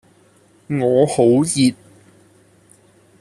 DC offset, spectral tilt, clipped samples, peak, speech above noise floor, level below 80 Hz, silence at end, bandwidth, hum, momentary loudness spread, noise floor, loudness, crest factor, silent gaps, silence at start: under 0.1%; -5.5 dB/octave; under 0.1%; -2 dBFS; 38 dB; -58 dBFS; 1.5 s; 13.5 kHz; none; 6 LU; -53 dBFS; -16 LUFS; 16 dB; none; 0.7 s